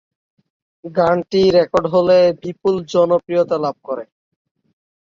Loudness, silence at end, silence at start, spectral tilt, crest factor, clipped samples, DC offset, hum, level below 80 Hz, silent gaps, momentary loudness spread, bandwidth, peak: -16 LUFS; 1.1 s; 0.85 s; -6.5 dB/octave; 16 dB; under 0.1%; under 0.1%; none; -54 dBFS; none; 13 LU; 7.4 kHz; -2 dBFS